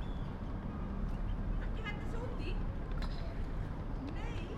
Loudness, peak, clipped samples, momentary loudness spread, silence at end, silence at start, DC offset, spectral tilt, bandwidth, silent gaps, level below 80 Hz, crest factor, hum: -42 LUFS; -26 dBFS; under 0.1%; 2 LU; 0 s; 0 s; under 0.1%; -7.5 dB/octave; 7.6 kHz; none; -40 dBFS; 12 dB; none